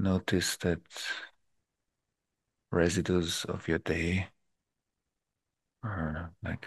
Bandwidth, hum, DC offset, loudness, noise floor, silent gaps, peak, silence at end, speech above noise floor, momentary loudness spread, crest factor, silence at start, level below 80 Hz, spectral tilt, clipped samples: 12.5 kHz; none; under 0.1%; -32 LUFS; -87 dBFS; none; -12 dBFS; 0 s; 56 dB; 11 LU; 22 dB; 0 s; -52 dBFS; -5 dB/octave; under 0.1%